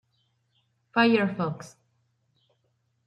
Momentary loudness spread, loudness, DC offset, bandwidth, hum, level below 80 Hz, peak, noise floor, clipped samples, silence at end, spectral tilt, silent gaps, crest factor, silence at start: 12 LU; -25 LUFS; under 0.1%; 10 kHz; none; -74 dBFS; -8 dBFS; -73 dBFS; under 0.1%; 1.4 s; -6.5 dB/octave; none; 22 dB; 0.95 s